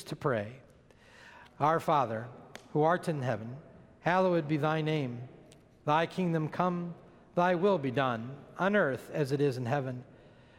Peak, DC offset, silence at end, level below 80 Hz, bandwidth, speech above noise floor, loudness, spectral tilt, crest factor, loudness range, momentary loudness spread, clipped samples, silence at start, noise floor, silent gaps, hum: -12 dBFS; under 0.1%; 0.55 s; -68 dBFS; 16 kHz; 28 dB; -31 LUFS; -7 dB/octave; 20 dB; 2 LU; 17 LU; under 0.1%; 0 s; -58 dBFS; none; none